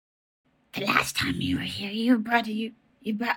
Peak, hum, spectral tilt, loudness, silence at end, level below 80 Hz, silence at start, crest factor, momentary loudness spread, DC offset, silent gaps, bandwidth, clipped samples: -4 dBFS; none; -4 dB/octave; -26 LUFS; 0 s; -58 dBFS; 0.75 s; 22 dB; 12 LU; under 0.1%; none; 18 kHz; under 0.1%